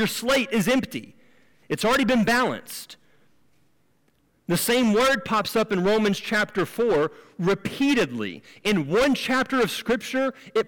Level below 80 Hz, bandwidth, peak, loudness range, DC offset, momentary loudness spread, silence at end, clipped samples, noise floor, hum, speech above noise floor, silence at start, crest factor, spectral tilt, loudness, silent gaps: -54 dBFS; 18 kHz; -14 dBFS; 3 LU; 0.1%; 12 LU; 0 s; under 0.1%; -66 dBFS; none; 43 dB; 0 s; 10 dB; -4.5 dB/octave; -23 LUFS; none